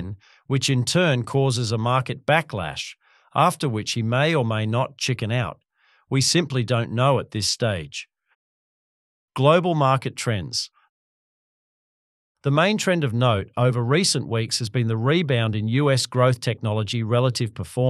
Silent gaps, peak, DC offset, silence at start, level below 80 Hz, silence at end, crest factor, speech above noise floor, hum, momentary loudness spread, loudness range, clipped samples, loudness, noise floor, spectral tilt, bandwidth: 8.35-9.28 s, 10.89-12.35 s; -2 dBFS; under 0.1%; 0 s; -56 dBFS; 0 s; 20 dB; over 69 dB; none; 9 LU; 3 LU; under 0.1%; -22 LUFS; under -90 dBFS; -5 dB/octave; 12.5 kHz